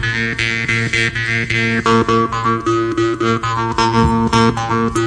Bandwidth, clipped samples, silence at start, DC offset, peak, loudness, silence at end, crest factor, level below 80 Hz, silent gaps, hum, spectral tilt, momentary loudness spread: 11 kHz; under 0.1%; 0 s; under 0.1%; -2 dBFS; -15 LUFS; 0 s; 14 dB; -34 dBFS; none; none; -5 dB/octave; 4 LU